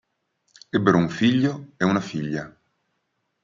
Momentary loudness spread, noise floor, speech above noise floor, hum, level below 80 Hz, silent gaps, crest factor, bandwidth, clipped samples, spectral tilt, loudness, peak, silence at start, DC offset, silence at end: 11 LU; -75 dBFS; 53 dB; none; -62 dBFS; none; 22 dB; 7.6 kHz; under 0.1%; -6.5 dB/octave; -23 LUFS; -4 dBFS; 0.75 s; under 0.1%; 0.95 s